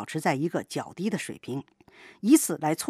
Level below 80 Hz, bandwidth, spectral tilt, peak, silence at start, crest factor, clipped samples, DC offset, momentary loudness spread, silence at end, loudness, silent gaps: -74 dBFS; 15.5 kHz; -4.5 dB/octave; -6 dBFS; 0 s; 20 dB; under 0.1%; under 0.1%; 15 LU; 0 s; -27 LUFS; none